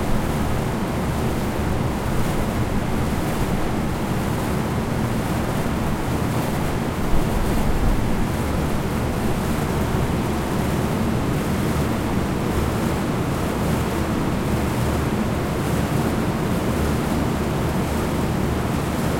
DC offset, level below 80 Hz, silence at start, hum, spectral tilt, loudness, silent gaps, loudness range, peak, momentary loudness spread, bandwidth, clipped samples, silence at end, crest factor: under 0.1%; -30 dBFS; 0 s; none; -6 dB/octave; -23 LUFS; none; 1 LU; -6 dBFS; 2 LU; 16.5 kHz; under 0.1%; 0 s; 16 dB